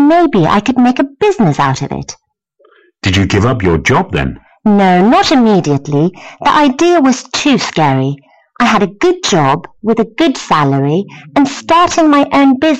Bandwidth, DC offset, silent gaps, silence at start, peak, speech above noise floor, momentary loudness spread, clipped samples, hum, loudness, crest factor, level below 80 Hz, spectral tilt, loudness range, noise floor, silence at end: 8.8 kHz; under 0.1%; none; 0 s; -2 dBFS; 42 dB; 8 LU; under 0.1%; none; -11 LUFS; 10 dB; -38 dBFS; -5.5 dB/octave; 3 LU; -52 dBFS; 0 s